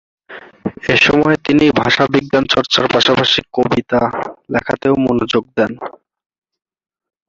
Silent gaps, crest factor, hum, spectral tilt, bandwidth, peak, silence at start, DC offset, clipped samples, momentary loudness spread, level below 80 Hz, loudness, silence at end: none; 16 dB; none; -5 dB/octave; 7.6 kHz; 0 dBFS; 0.3 s; under 0.1%; under 0.1%; 11 LU; -46 dBFS; -14 LUFS; 1.4 s